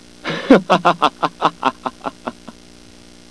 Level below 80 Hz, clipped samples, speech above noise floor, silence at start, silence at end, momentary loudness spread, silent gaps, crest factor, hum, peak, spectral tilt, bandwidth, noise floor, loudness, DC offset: -50 dBFS; 0.3%; 27 dB; 0.25 s; 0.8 s; 16 LU; none; 18 dB; 60 Hz at -50 dBFS; 0 dBFS; -5.5 dB/octave; 11 kHz; -43 dBFS; -17 LUFS; 0.3%